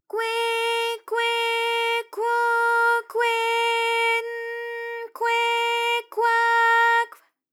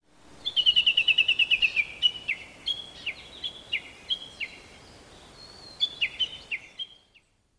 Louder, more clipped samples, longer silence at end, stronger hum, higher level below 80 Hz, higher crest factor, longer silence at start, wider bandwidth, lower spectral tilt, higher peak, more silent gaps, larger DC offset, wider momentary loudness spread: first, -22 LUFS vs -25 LUFS; neither; second, 0.45 s vs 0.75 s; neither; second, under -90 dBFS vs -60 dBFS; second, 14 dB vs 20 dB; second, 0.15 s vs 0.3 s; first, 17.5 kHz vs 11 kHz; second, 3 dB/octave vs 0 dB/octave; about the same, -10 dBFS vs -10 dBFS; neither; neither; second, 12 LU vs 17 LU